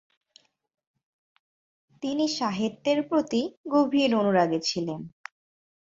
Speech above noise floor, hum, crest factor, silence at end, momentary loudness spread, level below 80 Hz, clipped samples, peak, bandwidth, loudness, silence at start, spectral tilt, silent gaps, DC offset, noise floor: 37 dB; none; 18 dB; 0.85 s; 14 LU; -70 dBFS; under 0.1%; -8 dBFS; 7.8 kHz; -26 LUFS; 2 s; -5 dB/octave; 3.57-3.64 s; under 0.1%; -62 dBFS